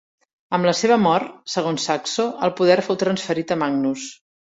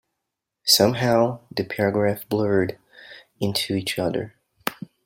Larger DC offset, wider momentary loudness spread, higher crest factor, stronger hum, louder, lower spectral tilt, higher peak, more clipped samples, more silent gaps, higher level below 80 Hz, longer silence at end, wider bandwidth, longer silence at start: neither; second, 8 LU vs 14 LU; about the same, 18 dB vs 22 dB; neither; about the same, -20 LUFS vs -22 LUFS; about the same, -4.5 dB/octave vs -4 dB/octave; about the same, -2 dBFS vs -2 dBFS; neither; neither; about the same, -64 dBFS vs -60 dBFS; about the same, 0.45 s vs 0.35 s; second, 8 kHz vs 16.5 kHz; second, 0.5 s vs 0.65 s